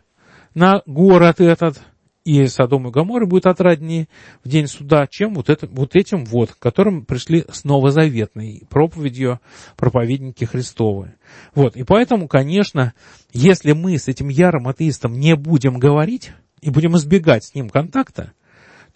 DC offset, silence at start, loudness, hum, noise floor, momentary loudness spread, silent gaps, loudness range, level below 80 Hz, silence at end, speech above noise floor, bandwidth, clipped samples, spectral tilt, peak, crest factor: under 0.1%; 0.55 s; -16 LUFS; none; -50 dBFS; 10 LU; none; 4 LU; -46 dBFS; 0.7 s; 35 dB; 8.8 kHz; under 0.1%; -7 dB/octave; 0 dBFS; 16 dB